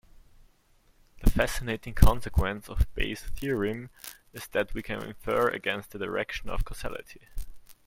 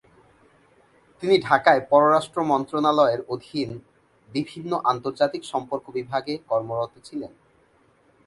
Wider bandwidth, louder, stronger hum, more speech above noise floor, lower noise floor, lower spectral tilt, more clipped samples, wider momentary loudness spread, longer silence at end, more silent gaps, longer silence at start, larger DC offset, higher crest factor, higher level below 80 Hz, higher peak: first, 16.5 kHz vs 11.5 kHz; second, -30 LUFS vs -23 LUFS; neither; about the same, 36 dB vs 38 dB; about the same, -63 dBFS vs -60 dBFS; about the same, -5.5 dB/octave vs -5.5 dB/octave; neither; first, 18 LU vs 14 LU; second, 0.15 s vs 1 s; neither; about the same, 1.2 s vs 1.2 s; neither; about the same, 26 dB vs 22 dB; first, -32 dBFS vs -66 dBFS; about the same, -2 dBFS vs -2 dBFS